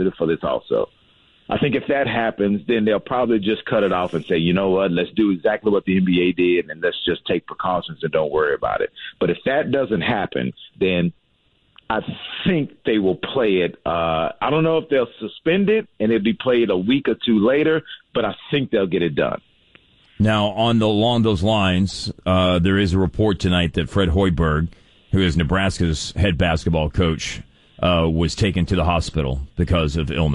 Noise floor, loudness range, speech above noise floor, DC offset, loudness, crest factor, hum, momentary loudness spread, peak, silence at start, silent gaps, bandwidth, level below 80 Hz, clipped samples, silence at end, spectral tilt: -62 dBFS; 3 LU; 43 dB; under 0.1%; -20 LUFS; 12 dB; none; 7 LU; -8 dBFS; 0 s; none; 11 kHz; -36 dBFS; under 0.1%; 0 s; -6.5 dB/octave